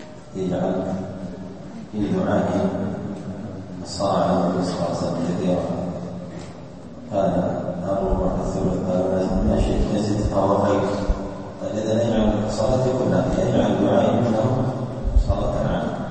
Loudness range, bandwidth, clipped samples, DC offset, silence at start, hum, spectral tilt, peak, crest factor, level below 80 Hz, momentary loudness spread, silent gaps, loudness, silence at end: 5 LU; 8.8 kHz; under 0.1%; 0.5%; 0 s; none; -7.5 dB/octave; -4 dBFS; 18 dB; -32 dBFS; 13 LU; none; -22 LUFS; 0 s